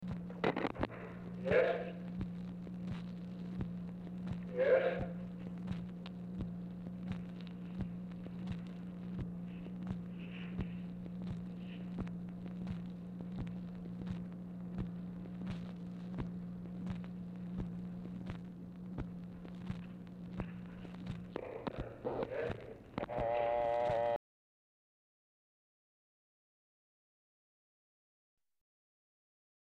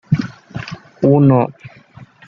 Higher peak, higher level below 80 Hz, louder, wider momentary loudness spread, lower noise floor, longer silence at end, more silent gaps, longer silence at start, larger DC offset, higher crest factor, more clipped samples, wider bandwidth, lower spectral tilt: second, -20 dBFS vs -2 dBFS; second, -58 dBFS vs -52 dBFS; second, -42 LUFS vs -14 LUFS; second, 12 LU vs 18 LU; first, under -90 dBFS vs -42 dBFS; first, 5.45 s vs 0.25 s; neither; about the same, 0 s vs 0.1 s; neither; first, 22 dB vs 14 dB; neither; about the same, 7.2 kHz vs 6.6 kHz; about the same, -8.5 dB/octave vs -9.5 dB/octave